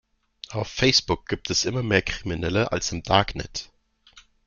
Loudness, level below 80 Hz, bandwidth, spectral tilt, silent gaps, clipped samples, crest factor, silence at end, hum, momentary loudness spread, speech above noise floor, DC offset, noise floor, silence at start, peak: -24 LUFS; -44 dBFS; 7.4 kHz; -3.5 dB/octave; none; under 0.1%; 24 dB; 0.25 s; none; 14 LU; 31 dB; under 0.1%; -55 dBFS; 0.5 s; -2 dBFS